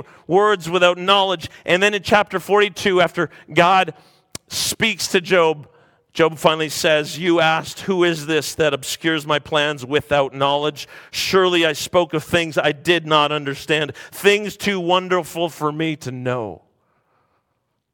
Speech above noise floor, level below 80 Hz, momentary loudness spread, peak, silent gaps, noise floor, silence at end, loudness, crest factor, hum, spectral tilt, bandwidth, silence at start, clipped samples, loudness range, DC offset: 53 dB; -56 dBFS; 9 LU; 0 dBFS; none; -72 dBFS; 1.4 s; -18 LUFS; 20 dB; none; -4 dB/octave; 17.5 kHz; 0.3 s; under 0.1%; 3 LU; under 0.1%